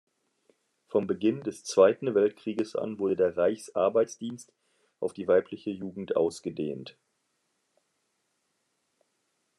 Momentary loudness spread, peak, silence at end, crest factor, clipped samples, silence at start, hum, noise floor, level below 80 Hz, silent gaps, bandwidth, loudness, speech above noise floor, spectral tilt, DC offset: 14 LU; -8 dBFS; 2.7 s; 22 dB; under 0.1%; 0.9 s; none; -77 dBFS; -80 dBFS; none; 12 kHz; -28 LUFS; 49 dB; -5.5 dB/octave; under 0.1%